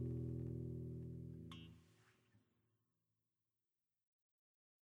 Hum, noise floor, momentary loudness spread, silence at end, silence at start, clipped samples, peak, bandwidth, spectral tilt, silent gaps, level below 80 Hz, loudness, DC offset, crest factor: none; under -90 dBFS; 13 LU; 2.45 s; 0 s; under 0.1%; -36 dBFS; 7 kHz; -9 dB/octave; none; -66 dBFS; -50 LUFS; under 0.1%; 16 dB